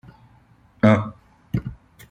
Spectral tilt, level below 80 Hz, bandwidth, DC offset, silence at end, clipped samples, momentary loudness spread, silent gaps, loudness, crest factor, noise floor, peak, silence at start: -8.5 dB/octave; -48 dBFS; 14.5 kHz; under 0.1%; 0.35 s; under 0.1%; 17 LU; none; -21 LUFS; 22 dB; -55 dBFS; -2 dBFS; 0.85 s